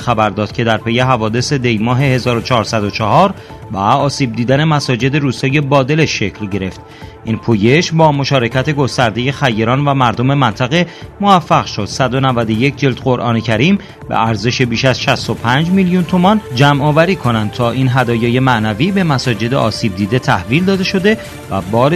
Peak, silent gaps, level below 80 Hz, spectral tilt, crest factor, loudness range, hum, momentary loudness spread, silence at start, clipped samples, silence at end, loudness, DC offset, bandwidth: 0 dBFS; none; -42 dBFS; -6 dB/octave; 12 dB; 2 LU; none; 6 LU; 0 s; under 0.1%; 0 s; -13 LUFS; under 0.1%; 13.5 kHz